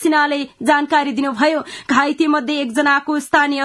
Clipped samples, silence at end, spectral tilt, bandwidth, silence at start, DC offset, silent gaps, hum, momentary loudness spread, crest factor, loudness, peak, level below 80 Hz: under 0.1%; 0 s; -3 dB/octave; 12 kHz; 0 s; under 0.1%; none; none; 4 LU; 16 dB; -17 LUFS; 0 dBFS; -62 dBFS